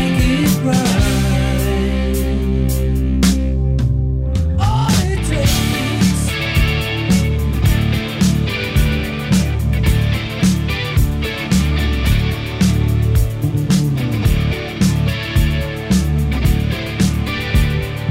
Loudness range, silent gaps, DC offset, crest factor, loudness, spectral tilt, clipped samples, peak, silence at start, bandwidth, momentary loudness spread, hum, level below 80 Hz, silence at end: 1 LU; none; under 0.1%; 12 dB; -17 LUFS; -5.5 dB/octave; under 0.1%; -2 dBFS; 0 s; 16.5 kHz; 3 LU; none; -20 dBFS; 0 s